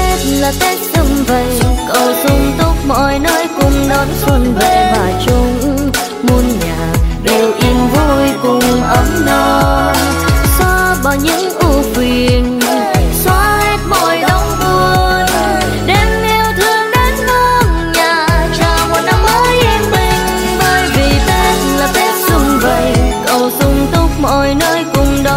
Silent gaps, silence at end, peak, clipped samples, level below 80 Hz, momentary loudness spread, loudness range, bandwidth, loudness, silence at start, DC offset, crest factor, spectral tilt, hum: none; 0 s; 0 dBFS; under 0.1%; -18 dBFS; 3 LU; 1 LU; 16.5 kHz; -11 LUFS; 0 s; under 0.1%; 10 dB; -4.5 dB/octave; none